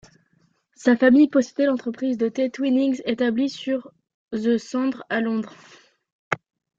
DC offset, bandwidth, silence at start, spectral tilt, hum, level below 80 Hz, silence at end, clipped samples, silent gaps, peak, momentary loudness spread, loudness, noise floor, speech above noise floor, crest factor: under 0.1%; 7.8 kHz; 0.8 s; -5.5 dB/octave; none; -68 dBFS; 0.4 s; under 0.1%; 4.14-4.28 s, 6.12-6.31 s; -2 dBFS; 13 LU; -22 LUFS; -65 dBFS; 44 dB; 20 dB